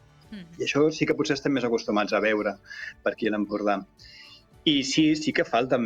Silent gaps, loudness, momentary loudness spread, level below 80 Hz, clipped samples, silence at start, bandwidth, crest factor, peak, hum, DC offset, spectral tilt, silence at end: none; -25 LUFS; 15 LU; -60 dBFS; under 0.1%; 0.3 s; 9 kHz; 16 dB; -10 dBFS; none; under 0.1%; -4.5 dB/octave; 0 s